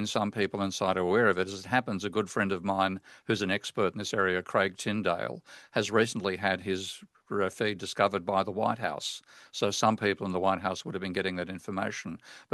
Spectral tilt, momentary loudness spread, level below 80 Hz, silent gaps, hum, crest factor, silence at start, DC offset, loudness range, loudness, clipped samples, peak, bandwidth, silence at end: -4.5 dB/octave; 10 LU; -72 dBFS; none; none; 22 dB; 0 s; under 0.1%; 2 LU; -30 LUFS; under 0.1%; -8 dBFS; 12.5 kHz; 0.1 s